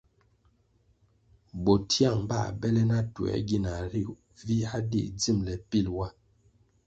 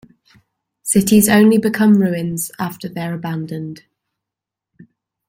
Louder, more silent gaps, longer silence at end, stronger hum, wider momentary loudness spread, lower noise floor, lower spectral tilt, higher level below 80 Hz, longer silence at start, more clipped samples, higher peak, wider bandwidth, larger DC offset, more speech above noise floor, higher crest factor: second, -29 LUFS vs -16 LUFS; neither; second, 0.75 s vs 1.55 s; neither; second, 10 LU vs 16 LU; second, -67 dBFS vs -85 dBFS; about the same, -6 dB/octave vs -5 dB/octave; first, -48 dBFS vs -54 dBFS; first, 1.55 s vs 0.85 s; neither; second, -10 dBFS vs -2 dBFS; second, 8.4 kHz vs 16.5 kHz; neither; second, 39 dB vs 70 dB; about the same, 20 dB vs 16 dB